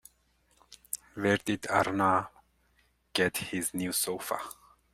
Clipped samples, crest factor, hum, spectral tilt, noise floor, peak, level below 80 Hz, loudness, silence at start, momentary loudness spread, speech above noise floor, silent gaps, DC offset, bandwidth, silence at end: under 0.1%; 22 dB; none; -3.5 dB/octave; -69 dBFS; -12 dBFS; -66 dBFS; -30 LUFS; 0.7 s; 13 LU; 40 dB; none; under 0.1%; 16 kHz; 0.4 s